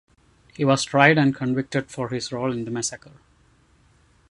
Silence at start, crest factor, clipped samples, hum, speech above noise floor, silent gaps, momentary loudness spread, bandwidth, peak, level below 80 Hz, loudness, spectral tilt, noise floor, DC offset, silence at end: 0.6 s; 22 dB; under 0.1%; none; 37 dB; none; 12 LU; 11.5 kHz; -2 dBFS; -60 dBFS; -22 LUFS; -5 dB/octave; -59 dBFS; under 0.1%; 1.35 s